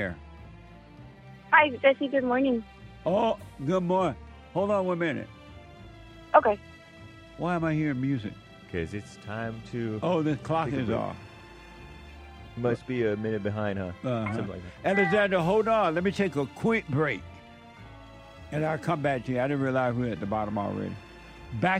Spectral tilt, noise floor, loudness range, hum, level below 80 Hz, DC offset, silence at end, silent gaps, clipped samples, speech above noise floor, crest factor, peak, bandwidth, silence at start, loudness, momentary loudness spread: -7 dB/octave; -48 dBFS; 6 LU; none; -54 dBFS; under 0.1%; 0 s; none; under 0.1%; 21 dB; 24 dB; -4 dBFS; 13 kHz; 0 s; -28 LUFS; 24 LU